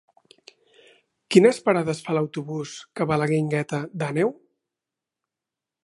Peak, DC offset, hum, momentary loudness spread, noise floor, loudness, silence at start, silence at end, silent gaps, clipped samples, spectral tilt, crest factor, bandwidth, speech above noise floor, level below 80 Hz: -2 dBFS; under 0.1%; none; 13 LU; -88 dBFS; -23 LUFS; 1.3 s; 1.5 s; none; under 0.1%; -6 dB/octave; 24 dB; 11.5 kHz; 66 dB; -66 dBFS